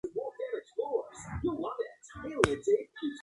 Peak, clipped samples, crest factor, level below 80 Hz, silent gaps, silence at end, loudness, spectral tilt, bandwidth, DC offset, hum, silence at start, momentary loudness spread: -2 dBFS; under 0.1%; 30 dB; -54 dBFS; none; 0 s; -34 LUFS; -5.5 dB/octave; 11.5 kHz; under 0.1%; none; 0.05 s; 11 LU